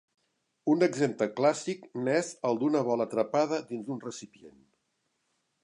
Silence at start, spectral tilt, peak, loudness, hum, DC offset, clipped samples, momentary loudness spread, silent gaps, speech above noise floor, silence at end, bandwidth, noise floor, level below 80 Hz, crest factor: 0.65 s; -5.5 dB/octave; -10 dBFS; -29 LUFS; none; under 0.1%; under 0.1%; 11 LU; none; 49 dB; 1.15 s; 11 kHz; -78 dBFS; -82 dBFS; 20 dB